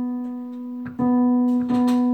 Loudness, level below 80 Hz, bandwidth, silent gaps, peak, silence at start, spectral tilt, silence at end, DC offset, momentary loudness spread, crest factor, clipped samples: -21 LUFS; -60 dBFS; 8.6 kHz; none; -12 dBFS; 0 s; -7.5 dB/octave; 0 s; under 0.1%; 13 LU; 8 dB; under 0.1%